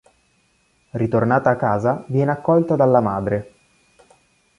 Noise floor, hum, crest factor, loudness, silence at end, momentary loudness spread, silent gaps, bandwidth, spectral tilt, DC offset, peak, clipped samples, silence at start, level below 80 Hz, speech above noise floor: -62 dBFS; none; 18 dB; -19 LUFS; 1.15 s; 9 LU; none; 11 kHz; -9.5 dB/octave; under 0.1%; -2 dBFS; under 0.1%; 0.95 s; -52 dBFS; 44 dB